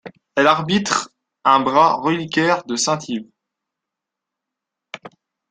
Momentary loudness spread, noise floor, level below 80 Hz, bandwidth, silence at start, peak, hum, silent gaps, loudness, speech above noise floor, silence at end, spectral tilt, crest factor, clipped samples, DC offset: 21 LU; -84 dBFS; -62 dBFS; 10 kHz; 0.05 s; -2 dBFS; none; none; -18 LUFS; 66 dB; 0.45 s; -3.5 dB/octave; 18 dB; under 0.1%; under 0.1%